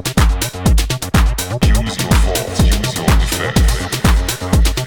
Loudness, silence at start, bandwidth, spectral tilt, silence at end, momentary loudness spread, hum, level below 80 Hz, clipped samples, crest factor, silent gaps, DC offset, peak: -15 LUFS; 0 s; 19.5 kHz; -4.5 dB/octave; 0 s; 2 LU; none; -16 dBFS; under 0.1%; 12 dB; none; under 0.1%; -2 dBFS